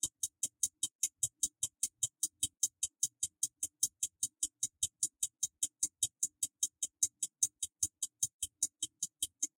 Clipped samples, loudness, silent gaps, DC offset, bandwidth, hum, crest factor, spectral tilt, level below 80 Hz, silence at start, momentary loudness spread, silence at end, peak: under 0.1%; -36 LUFS; 0.95-0.99 s, 8.34-8.39 s; under 0.1%; 16.5 kHz; none; 24 dB; 1.5 dB/octave; -72 dBFS; 0.05 s; 3 LU; 0.1 s; -16 dBFS